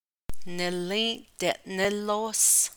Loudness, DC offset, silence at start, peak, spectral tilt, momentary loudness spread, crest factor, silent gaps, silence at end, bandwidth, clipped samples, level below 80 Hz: -26 LUFS; under 0.1%; 0 s; -8 dBFS; -1.5 dB/octave; 12 LU; 20 dB; none; 0 s; over 20 kHz; under 0.1%; -50 dBFS